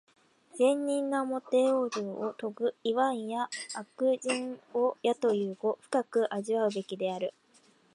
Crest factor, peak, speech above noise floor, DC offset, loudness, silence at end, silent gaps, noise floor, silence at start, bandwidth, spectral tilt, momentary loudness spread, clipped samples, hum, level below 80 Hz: 18 dB; -14 dBFS; 34 dB; under 0.1%; -31 LUFS; 0.65 s; none; -64 dBFS; 0.55 s; 11.5 kHz; -4.5 dB/octave; 8 LU; under 0.1%; none; -86 dBFS